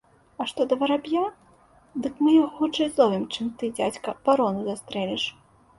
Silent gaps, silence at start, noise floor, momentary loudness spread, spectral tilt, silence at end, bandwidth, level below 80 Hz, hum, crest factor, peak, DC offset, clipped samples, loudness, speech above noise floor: none; 0.4 s; -57 dBFS; 11 LU; -5 dB/octave; 0.45 s; 11.5 kHz; -62 dBFS; none; 20 dB; -6 dBFS; under 0.1%; under 0.1%; -25 LUFS; 33 dB